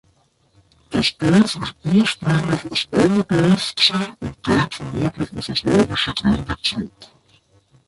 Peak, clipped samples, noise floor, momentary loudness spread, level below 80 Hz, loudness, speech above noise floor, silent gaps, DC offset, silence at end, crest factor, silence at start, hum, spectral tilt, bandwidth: -2 dBFS; under 0.1%; -60 dBFS; 9 LU; -44 dBFS; -19 LUFS; 41 dB; none; under 0.1%; 0.8 s; 18 dB; 0.9 s; none; -5.5 dB/octave; 11.5 kHz